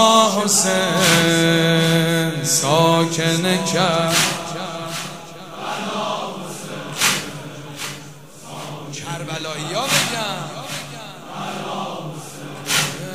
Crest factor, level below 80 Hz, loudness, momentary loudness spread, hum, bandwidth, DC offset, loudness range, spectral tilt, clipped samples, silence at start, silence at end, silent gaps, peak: 20 dB; -58 dBFS; -18 LUFS; 18 LU; none; 16 kHz; 0.5%; 9 LU; -3 dB/octave; under 0.1%; 0 s; 0 s; none; 0 dBFS